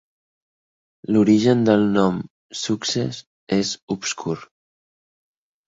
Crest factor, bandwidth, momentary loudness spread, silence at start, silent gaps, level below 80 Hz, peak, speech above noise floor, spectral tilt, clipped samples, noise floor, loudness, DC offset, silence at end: 18 dB; 8 kHz; 15 LU; 1.1 s; 2.30-2.49 s, 3.27-3.47 s, 3.82-3.87 s; -58 dBFS; -4 dBFS; over 70 dB; -5 dB/octave; under 0.1%; under -90 dBFS; -20 LUFS; under 0.1%; 1.25 s